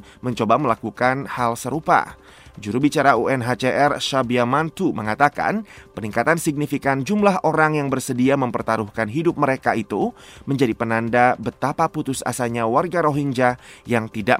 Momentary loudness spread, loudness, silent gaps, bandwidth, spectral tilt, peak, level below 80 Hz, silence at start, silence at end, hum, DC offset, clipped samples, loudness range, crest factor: 7 LU; -20 LUFS; none; 16 kHz; -5.5 dB/octave; 0 dBFS; -52 dBFS; 0.25 s; 0 s; none; under 0.1%; under 0.1%; 2 LU; 20 dB